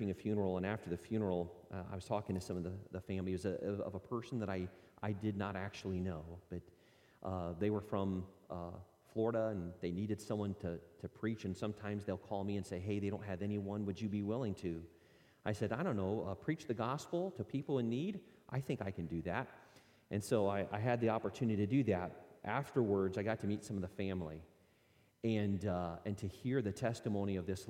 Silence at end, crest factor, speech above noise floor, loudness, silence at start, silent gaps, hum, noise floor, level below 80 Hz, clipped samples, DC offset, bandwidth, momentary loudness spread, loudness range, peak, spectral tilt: 0 s; 20 dB; 32 dB; -40 LUFS; 0 s; none; none; -71 dBFS; -68 dBFS; under 0.1%; under 0.1%; 16 kHz; 11 LU; 5 LU; -20 dBFS; -7.5 dB/octave